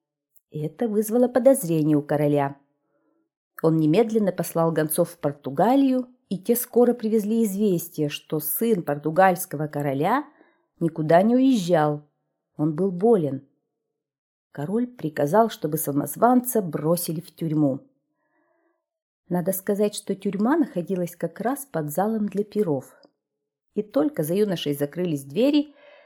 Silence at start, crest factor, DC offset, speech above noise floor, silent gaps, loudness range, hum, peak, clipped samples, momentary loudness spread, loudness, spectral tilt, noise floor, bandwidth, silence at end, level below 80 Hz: 0.55 s; 20 dB; under 0.1%; 61 dB; 3.37-3.51 s, 14.18-14.50 s, 19.02-19.23 s; 5 LU; none; -4 dBFS; under 0.1%; 10 LU; -23 LUFS; -6 dB/octave; -83 dBFS; 19.5 kHz; 0.4 s; -72 dBFS